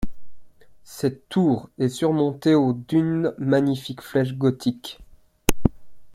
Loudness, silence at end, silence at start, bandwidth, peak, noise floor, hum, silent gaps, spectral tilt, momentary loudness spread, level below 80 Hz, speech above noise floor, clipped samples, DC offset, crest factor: -23 LUFS; 0 s; 0 s; 16.5 kHz; 0 dBFS; -40 dBFS; none; none; -6.5 dB/octave; 8 LU; -40 dBFS; 19 dB; under 0.1%; under 0.1%; 22 dB